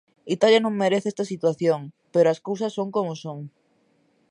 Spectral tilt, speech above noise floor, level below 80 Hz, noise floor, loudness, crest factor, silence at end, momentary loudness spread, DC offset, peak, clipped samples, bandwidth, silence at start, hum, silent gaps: -5.5 dB/octave; 42 dB; -76 dBFS; -65 dBFS; -23 LUFS; 18 dB; 0.8 s; 14 LU; under 0.1%; -6 dBFS; under 0.1%; 10.5 kHz; 0.25 s; none; none